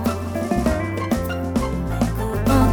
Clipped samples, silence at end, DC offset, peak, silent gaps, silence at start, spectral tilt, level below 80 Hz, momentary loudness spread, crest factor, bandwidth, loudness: under 0.1%; 0 s; under 0.1%; -6 dBFS; none; 0 s; -6.5 dB/octave; -28 dBFS; 4 LU; 16 dB; over 20 kHz; -22 LUFS